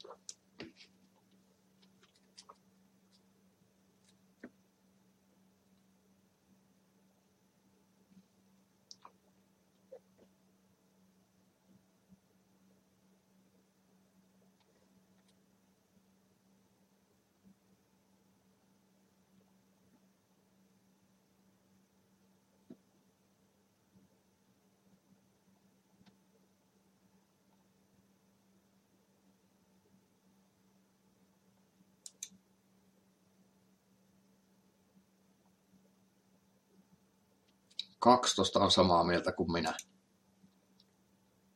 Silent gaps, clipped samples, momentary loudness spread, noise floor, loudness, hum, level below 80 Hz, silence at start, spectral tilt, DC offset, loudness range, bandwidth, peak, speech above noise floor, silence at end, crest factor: none; under 0.1%; 31 LU; -73 dBFS; -30 LUFS; none; -78 dBFS; 0.1 s; -4 dB/octave; under 0.1%; 26 LU; 16.5 kHz; -10 dBFS; 43 dB; 1.75 s; 32 dB